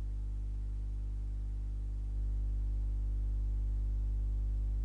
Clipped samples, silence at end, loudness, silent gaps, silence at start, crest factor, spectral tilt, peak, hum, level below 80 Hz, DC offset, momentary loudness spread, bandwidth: under 0.1%; 0 s; -39 LUFS; none; 0 s; 6 dB; -9 dB/octave; -28 dBFS; 50 Hz at -35 dBFS; -34 dBFS; under 0.1%; 4 LU; 1.4 kHz